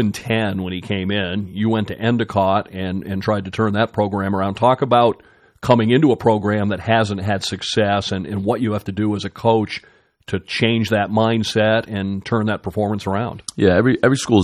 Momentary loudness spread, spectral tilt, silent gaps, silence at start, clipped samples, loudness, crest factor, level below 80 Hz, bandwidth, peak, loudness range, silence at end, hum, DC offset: 9 LU; -6 dB/octave; none; 0 s; under 0.1%; -19 LUFS; 18 dB; -54 dBFS; 14 kHz; 0 dBFS; 4 LU; 0 s; none; under 0.1%